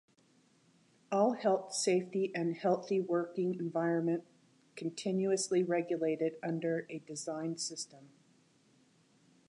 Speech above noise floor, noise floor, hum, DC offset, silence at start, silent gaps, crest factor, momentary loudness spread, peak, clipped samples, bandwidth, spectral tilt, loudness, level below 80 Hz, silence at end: 35 dB; -69 dBFS; none; under 0.1%; 1.1 s; none; 18 dB; 9 LU; -18 dBFS; under 0.1%; 11.5 kHz; -5 dB/octave; -34 LUFS; -88 dBFS; 1.4 s